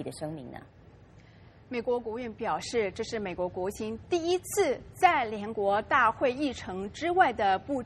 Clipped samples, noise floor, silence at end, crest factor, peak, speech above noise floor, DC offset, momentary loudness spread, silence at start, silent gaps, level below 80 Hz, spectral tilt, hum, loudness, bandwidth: under 0.1%; -54 dBFS; 0 s; 22 dB; -8 dBFS; 25 dB; under 0.1%; 13 LU; 0 s; none; -58 dBFS; -4 dB/octave; none; -29 LUFS; 13 kHz